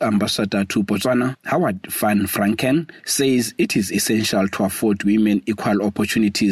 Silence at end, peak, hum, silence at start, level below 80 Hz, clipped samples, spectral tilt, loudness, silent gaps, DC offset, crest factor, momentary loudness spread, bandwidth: 0 s; -6 dBFS; none; 0 s; -54 dBFS; under 0.1%; -4.5 dB/octave; -19 LUFS; none; under 0.1%; 12 dB; 3 LU; 15.5 kHz